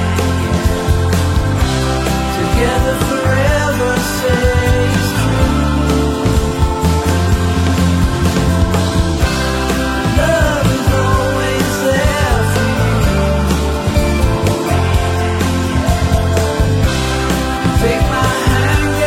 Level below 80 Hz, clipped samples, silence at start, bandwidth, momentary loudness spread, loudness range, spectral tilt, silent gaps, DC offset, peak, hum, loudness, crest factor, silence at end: -20 dBFS; under 0.1%; 0 s; 16.5 kHz; 2 LU; 1 LU; -5.5 dB/octave; none; under 0.1%; -2 dBFS; none; -14 LUFS; 12 dB; 0 s